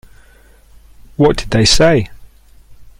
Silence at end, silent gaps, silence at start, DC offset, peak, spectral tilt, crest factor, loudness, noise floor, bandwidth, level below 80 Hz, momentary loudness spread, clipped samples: 0.15 s; none; 1.2 s; under 0.1%; 0 dBFS; -4.5 dB/octave; 16 dB; -12 LUFS; -45 dBFS; 16 kHz; -28 dBFS; 17 LU; under 0.1%